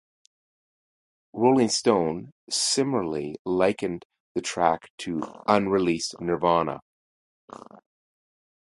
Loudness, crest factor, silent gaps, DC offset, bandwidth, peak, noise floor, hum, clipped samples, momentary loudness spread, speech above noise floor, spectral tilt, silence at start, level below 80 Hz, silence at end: -25 LUFS; 22 dB; 2.32-2.47 s, 3.39-3.45 s, 4.05-4.10 s, 4.20-4.35 s, 4.90-4.98 s; under 0.1%; 11.5 kHz; -4 dBFS; under -90 dBFS; none; under 0.1%; 13 LU; over 65 dB; -4 dB/octave; 1.35 s; -60 dBFS; 1.85 s